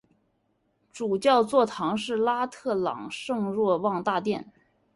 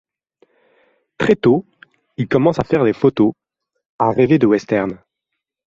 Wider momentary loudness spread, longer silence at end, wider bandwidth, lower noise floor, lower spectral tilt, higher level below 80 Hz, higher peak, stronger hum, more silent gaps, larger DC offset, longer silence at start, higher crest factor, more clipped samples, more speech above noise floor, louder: about the same, 10 LU vs 10 LU; second, 0.5 s vs 0.7 s; first, 11.5 kHz vs 7.6 kHz; second, -72 dBFS vs -79 dBFS; second, -5.5 dB/octave vs -8 dB/octave; second, -68 dBFS vs -52 dBFS; second, -8 dBFS vs -2 dBFS; neither; second, none vs 3.86-3.99 s; neither; second, 0.95 s vs 1.2 s; about the same, 18 dB vs 16 dB; neither; second, 46 dB vs 64 dB; second, -26 LUFS vs -16 LUFS